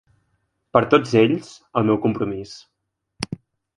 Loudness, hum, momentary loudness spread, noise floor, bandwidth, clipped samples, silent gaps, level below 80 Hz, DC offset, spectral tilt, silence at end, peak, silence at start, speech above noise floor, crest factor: -20 LUFS; none; 16 LU; -78 dBFS; 11.5 kHz; under 0.1%; none; -54 dBFS; under 0.1%; -6.5 dB/octave; 0.45 s; 0 dBFS; 0.75 s; 59 dB; 22 dB